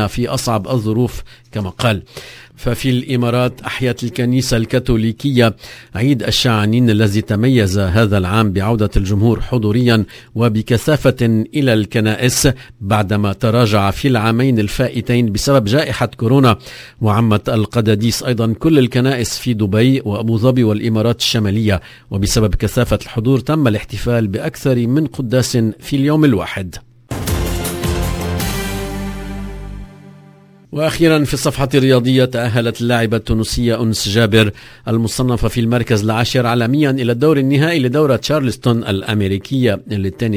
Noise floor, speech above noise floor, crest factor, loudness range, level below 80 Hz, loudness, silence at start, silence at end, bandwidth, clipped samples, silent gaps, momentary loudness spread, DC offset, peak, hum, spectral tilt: -43 dBFS; 29 dB; 14 dB; 4 LU; -32 dBFS; -15 LUFS; 0 s; 0 s; 16 kHz; under 0.1%; none; 8 LU; under 0.1%; 0 dBFS; none; -6 dB/octave